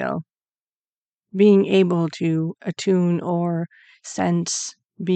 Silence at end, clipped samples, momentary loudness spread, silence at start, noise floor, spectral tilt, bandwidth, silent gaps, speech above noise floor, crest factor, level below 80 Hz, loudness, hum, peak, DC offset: 0 s; under 0.1%; 17 LU; 0 s; under -90 dBFS; -6 dB/octave; 9 kHz; 0.62-0.67 s, 0.77-1.19 s, 4.85-4.89 s; over 70 dB; 16 dB; -70 dBFS; -21 LUFS; none; -6 dBFS; under 0.1%